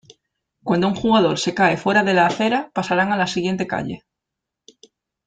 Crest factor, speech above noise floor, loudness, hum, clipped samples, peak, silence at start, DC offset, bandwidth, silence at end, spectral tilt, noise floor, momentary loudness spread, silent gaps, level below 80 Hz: 18 dB; 64 dB; -19 LUFS; none; under 0.1%; -2 dBFS; 0.65 s; under 0.1%; 9.2 kHz; 1.3 s; -5 dB/octave; -83 dBFS; 9 LU; none; -56 dBFS